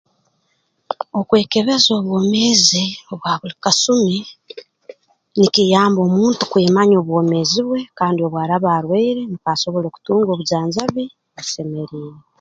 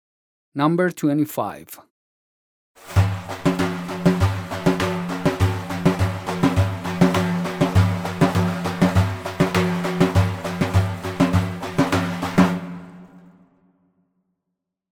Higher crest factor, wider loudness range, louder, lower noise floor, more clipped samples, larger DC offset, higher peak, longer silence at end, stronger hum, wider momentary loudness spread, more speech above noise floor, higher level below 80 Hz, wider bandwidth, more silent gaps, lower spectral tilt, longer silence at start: about the same, 18 dB vs 18 dB; about the same, 4 LU vs 4 LU; first, -16 LUFS vs -21 LUFS; second, -66 dBFS vs -80 dBFS; neither; neither; first, 0 dBFS vs -4 dBFS; second, 0.2 s vs 1.75 s; neither; first, 14 LU vs 6 LU; second, 50 dB vs 59 dB; second, -60 dBFS vs -44 dBFS; second, 9.2 kHz vs 17 kHz; second, none vs 1.90-2.75 s; second, -4.5 dB/octave vs -6.5 dB/octave; first, 0.9 s vs 0.55 s